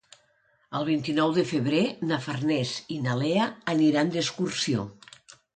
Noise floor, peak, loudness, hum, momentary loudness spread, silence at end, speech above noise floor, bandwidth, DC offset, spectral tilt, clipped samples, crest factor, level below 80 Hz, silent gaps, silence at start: -66 dBFS; -12 dBFS; -26 LUFS; none; 8 LU; 0.65 s; 41 dB; 9.4 kHz; under 0.1%; -5.5 dB/octave; under 0.1%; 16 dB; -66 dBFS; none; 0.7 s